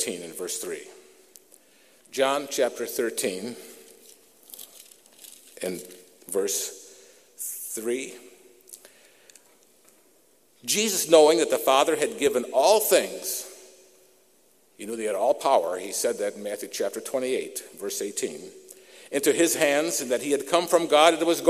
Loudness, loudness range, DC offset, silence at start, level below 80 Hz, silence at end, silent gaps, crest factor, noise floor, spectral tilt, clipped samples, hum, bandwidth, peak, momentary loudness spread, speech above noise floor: -24 LUFS; 12 LU; under 0.1%; 0 s; -76 dBFS; 0 s; none; 26 dB; -62 dBFS; -2 dB/octave; under 0.1%; none; 15.5 kHz; -2 dBFS; 23 LU; 37 dB